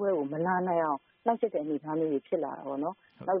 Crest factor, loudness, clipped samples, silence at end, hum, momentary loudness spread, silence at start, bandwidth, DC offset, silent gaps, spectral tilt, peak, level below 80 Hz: 18 dB; -31 LUFS; under 0.1%; 0 s; none; 7 LU; 0 s; 3.7 kHz; under 0.1%; none; -7 dB/octave; -12 dBFS; -76 dBFS